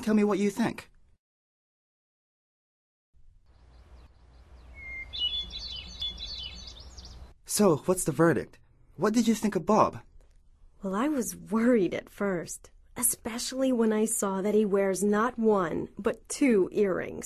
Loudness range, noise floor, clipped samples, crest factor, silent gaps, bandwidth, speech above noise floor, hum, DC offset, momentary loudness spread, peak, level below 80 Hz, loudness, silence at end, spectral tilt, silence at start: 10 LU; -57 dBFS; under 0.1%; 20 dB; 1.19-3.13 s; 13.5 kHz; 30 dB; none; under 0.1%; 17 LU; -8 dBFS; -54 dBFS; -28 LUFS; 0 s; -4.5 dB/octave; 0 s